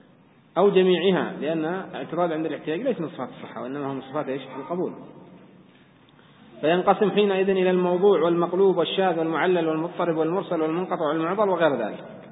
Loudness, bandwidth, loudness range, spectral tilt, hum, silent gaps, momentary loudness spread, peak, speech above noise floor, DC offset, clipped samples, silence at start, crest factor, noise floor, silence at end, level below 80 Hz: -23 LUFS; 4 kHz; 10 LU; -11 dB/octave; none; none; 12 LU; -6 dBFS; 32 dB; under 0.1%; under 0.1%; 0.55 s; 18 dB; -55 dBFS; 0 s; -72 dBFS